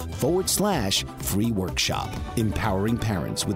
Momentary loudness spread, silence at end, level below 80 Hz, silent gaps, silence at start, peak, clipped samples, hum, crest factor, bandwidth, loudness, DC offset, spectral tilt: 5 LU; 0 s; -38 dBFS; none; 0 s; -10 dBFS; under 0.1%; none; 16 dB; 16 kHz; -25 LUFS; under 0.1%; -4 dB/octave